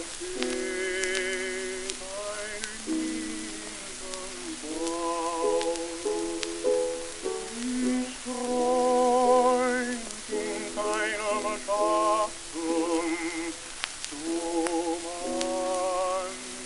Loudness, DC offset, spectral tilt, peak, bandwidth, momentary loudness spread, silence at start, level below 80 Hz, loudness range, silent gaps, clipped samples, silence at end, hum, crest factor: -29 LUFS; under 0.1%; -2 dB/octave; -4 dBFS; 12 kHz; 10 LU; 0 s; -54 dBFS; 6 LU; none; under 0.1%; 0 s; none; 24 dB